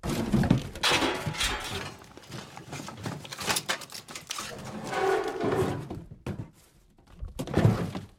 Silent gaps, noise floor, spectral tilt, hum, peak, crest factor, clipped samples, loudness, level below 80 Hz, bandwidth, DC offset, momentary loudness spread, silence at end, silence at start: none; -59 dBFS; -4.5 dB/octave; none; -8 dBFS; 22 dB; under 0.1%; -29 LUFS; -46 dBFS; 17 kHz; under 0.1%; 17 LU; 0.1 s; 0.05 s